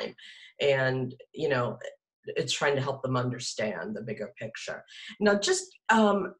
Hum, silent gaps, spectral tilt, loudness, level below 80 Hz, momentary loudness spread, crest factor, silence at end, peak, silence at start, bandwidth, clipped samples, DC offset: none; 2.13-2.23 s; -4.5 dB/octave; -29 LUFS; -68 dBFS; 17 LU; 20 dB; 0.05 s; -10 dBFS; 0 s; 12 kHz; under 0.1%; under 0.1%